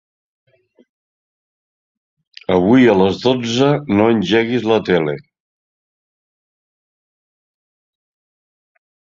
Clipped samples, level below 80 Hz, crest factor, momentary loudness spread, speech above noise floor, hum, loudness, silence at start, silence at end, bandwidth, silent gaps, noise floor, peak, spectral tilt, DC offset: under 0.1%; -52 dBFS; 18 dB; 8 LU; over 76 dB; none; -15 LUFS; 2.5 s; 4 s; 7.6 kHz; none; under -90 dBFS; -2 dBFS; -6.5 dB/octave; under 0.1%